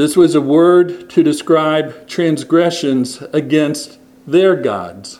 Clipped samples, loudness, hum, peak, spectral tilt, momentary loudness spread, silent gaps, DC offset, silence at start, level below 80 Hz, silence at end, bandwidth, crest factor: under 0.1%; -14 LUFS; none; 0 dBFS; -5.5 dB/octave; 9 LU; none; under 0.1%; 0 s; -60 dBFS; 0.05 s; 13.5 kHz; 14 dB